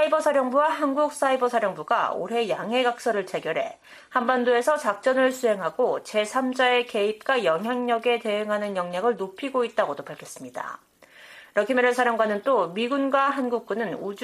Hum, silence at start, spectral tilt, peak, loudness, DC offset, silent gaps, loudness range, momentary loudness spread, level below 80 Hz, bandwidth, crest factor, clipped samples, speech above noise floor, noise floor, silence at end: none; 0 s; -4 dB/octave; -8 dBFS; -24 LUFS; under 0.1%; none; 4 LU; 8 LU; -74 dBFS; 14.5 kHz; 16 dB; under 0.1%; 25 dB; -49 dBFS; 0 s